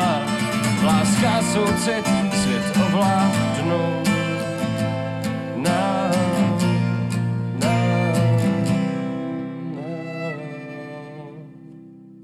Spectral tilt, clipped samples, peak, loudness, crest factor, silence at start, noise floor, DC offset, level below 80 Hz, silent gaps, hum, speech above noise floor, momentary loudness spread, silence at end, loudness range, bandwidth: -5.5 dB/octave; under 0.1%; -8 dBFS; -21 LUFS; 12 dB; 0 s; -43 dBFS; under 0.1%; -52 dBFS; none; none; 23 dB; 13 LU; 0 s; 6 LU; 14.5 kHz